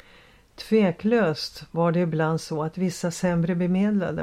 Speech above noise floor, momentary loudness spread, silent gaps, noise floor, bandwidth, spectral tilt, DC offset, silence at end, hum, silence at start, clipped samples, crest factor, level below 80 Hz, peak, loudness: 30 dB; 7 LU; none; -53 dBFS; 13.5 kHz; -6.5 dB/octave; under 0.1%; 0 s; none; 0.6 s; under 0.1%; 14 dB; -56 dBFS; -10 dBFS; -24 LUFS